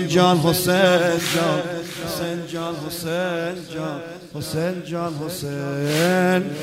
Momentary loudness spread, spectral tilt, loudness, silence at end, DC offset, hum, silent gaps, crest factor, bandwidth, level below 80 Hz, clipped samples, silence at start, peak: 12 LU; -5 dB/octave; -21 LUFS; 0 s; under 0.1%; none; none; 18 dB; 16 kHz; -54 dBFS; under 0.1%; 0 s; -2 dBFS